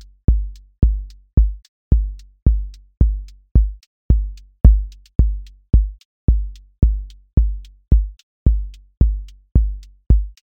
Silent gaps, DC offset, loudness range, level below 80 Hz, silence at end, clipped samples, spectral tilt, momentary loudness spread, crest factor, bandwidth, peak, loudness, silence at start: 1.33-1.37 s, 1.68-1.91 s, 3.51-3.55 s, 3.87-4.09 s, 6.05-6.28 s, 7.33-7.37 s, 8.23-8.46 s; under 0.1%; 2 LU; -18 dBFS; 0.2 s; under 0.1%; -10.5 dB/octave; 12 LU; 18 dB; 1.3 kHz; 0 dBFS; -21 LUFS; 0.3 s